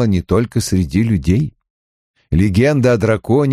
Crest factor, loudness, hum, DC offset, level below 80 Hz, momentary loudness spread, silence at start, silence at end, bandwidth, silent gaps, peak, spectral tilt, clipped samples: 12 dB; -15 LUFS; none; under 0.1%; -32 dBFS; 5 LU; 0 s; 0 s; 14.5 kHz; 1.70-2.14 s; -2 dBFS; -7 dB/octave; under 0.1%